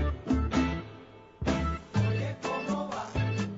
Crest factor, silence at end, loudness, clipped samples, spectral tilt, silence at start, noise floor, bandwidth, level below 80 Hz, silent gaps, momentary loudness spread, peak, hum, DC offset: 16 dB; 0 s; -31 LUFS; under 0.1%; -6.5 dB/octave; 0 s; -50 dBFS; 8 kHz; -38 dBFS; none; 7 LU; -16 dBFS; none; under 0.1%